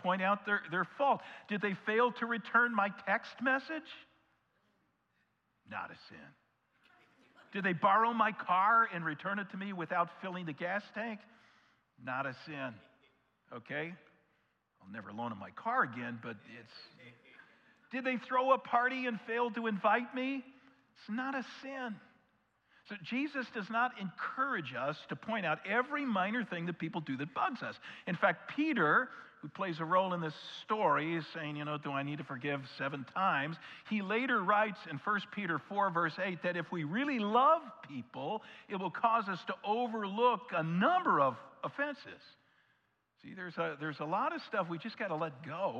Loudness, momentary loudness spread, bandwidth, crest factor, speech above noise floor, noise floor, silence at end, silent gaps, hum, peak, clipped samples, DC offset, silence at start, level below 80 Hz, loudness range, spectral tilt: -35 LUFS; 15 LU; 8.2 kHz; 20 dB; 43 dB; -78 dBFS; 0 s; none; none; -16 dBFS; under 0.1%; under 0.1%; 0 s; -88 dBFS; 9 LU; -7 dB/octave